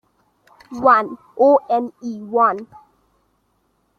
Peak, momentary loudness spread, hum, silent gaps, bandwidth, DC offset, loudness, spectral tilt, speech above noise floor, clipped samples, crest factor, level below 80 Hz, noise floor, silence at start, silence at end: -2 dBFS; 16 LU; none; none; 6.8 kHz; under 0.1%; -17 LUFS; -6.5 dB/octave; 48 dB; under 0.1%; 18 dB; -66 dBFS; -65 dBFS; 0.7 s; 1.35 s